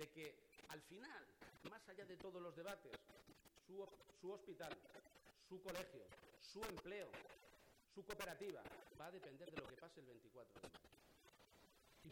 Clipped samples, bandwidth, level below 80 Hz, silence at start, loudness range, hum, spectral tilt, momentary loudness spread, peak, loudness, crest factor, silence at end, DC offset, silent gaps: under 0.1%; 18 kHz; -78 dBFS; 0 s; 3 LU; none; -4 dB/octave; 13 LU; -38 dBFS; -57 LUFS; 20 dB; 0 s; under 0.1%; none